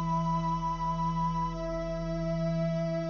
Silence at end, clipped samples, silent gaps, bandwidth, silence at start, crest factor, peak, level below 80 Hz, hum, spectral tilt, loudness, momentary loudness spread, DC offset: 0 s; under 0.1%; none; 7 kHz; 0 s; 10 dB; -20 dBFS; -44 dBFS; none; -8 dB/octave; -31 LUFS; 4 LU; under 0.1%